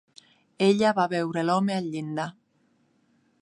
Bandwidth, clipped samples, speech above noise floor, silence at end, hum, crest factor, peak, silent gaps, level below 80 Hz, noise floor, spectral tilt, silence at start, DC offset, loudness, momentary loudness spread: 11.5 kHz; under 0.1%; 43 dB; 1.1 s; none; 18 dB; -8 dBFS; none; -72 dBFS; -67 dBFS; -6 dB/octave; 0.6 s; under 0.1%; -25 LUFS; 11 LU